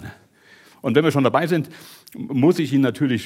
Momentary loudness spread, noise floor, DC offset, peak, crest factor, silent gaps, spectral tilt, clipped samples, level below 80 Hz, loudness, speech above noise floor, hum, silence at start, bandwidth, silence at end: 17 LU; -51 dBFS; under 0.1%; -2 dBFS; 18 dB; none; -7 dB/octave; under 0.1%; -66 dBFS; -19 LUFS; 32 dB; none; 0 s; 16.5 kHz; 0 s